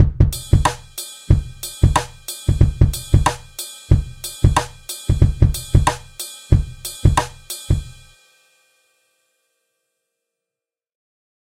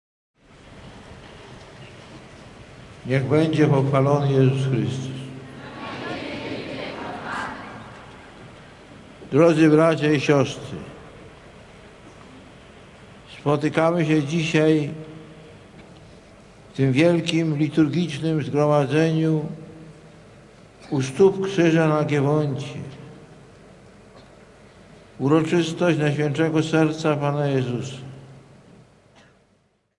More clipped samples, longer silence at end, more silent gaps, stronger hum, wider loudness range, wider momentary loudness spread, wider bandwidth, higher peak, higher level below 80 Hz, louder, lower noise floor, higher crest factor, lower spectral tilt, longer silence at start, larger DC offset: neither; first, 3.55 s vs 1.6 s; neither; neither; second, 6 LU vs 9 LU; second, 14 LU vs 24 LU; first, 16 kHz vs 11.5 kHz; about the same, -2 dBFS vs -4 dBFS; first, -24 dBFS vs -58 dBFS; about the same, -19 LUFS vs -21 LUFS; first, -88 dBFS vs -64 dBFS; about the same, 18 dB vs 20 dB; second, -5.5 dB/octave vs -7 dB/octave; second, 0 s vs 0.7 s; neither